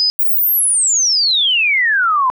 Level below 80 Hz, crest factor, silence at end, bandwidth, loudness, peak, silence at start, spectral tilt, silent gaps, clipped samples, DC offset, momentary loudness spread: -70 dBFS; 4 dB; 0.05 s; over 20 kHz; -11 LUFS; -10 dBFS; 0 s; 6.5 dB/octave; 0.10-0.19 s; under 0.1%; under 0.1%; 1 LU